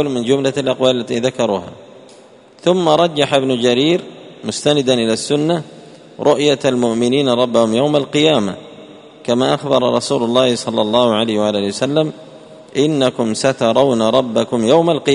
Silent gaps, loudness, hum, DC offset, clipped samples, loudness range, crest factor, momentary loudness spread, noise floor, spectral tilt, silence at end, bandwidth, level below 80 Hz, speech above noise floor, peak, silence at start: none; -15 LUFS; none; under 0.1%; under 0.1%; 1 LU; 16 dB; 7 LU; -43 dBFS; -5 dB/octave; 0 s; 11 kHz; -56 dBFS; 29 dB; 0 dBFS; 0 s